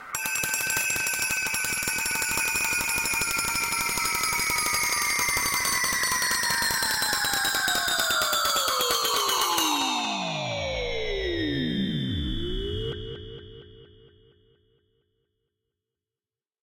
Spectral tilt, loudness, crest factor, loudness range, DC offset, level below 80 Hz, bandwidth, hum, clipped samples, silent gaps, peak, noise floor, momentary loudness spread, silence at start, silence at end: -1.5 dB/octave; -24 LUFS; 20 dB; 10 LU; under 0.1%; -44 dBFS; 17 kHz; none; under 0.1%; none; -8 dBFS; under -90 dBFS; 7 LU; 0 s; 2.8 s